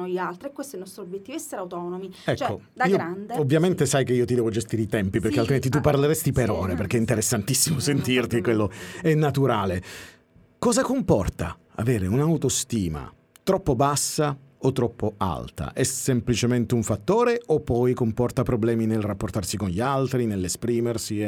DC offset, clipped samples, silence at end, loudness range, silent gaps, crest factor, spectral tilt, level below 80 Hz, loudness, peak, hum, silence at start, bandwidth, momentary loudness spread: under 0.1%; under 0.1%; 0 s; 3 LU; none; 18 dB; -5.5 dB/octave; -46 dBFS; -24 LUFS; -6 dBFS; none; 0 s; 19 kHz; 11 LU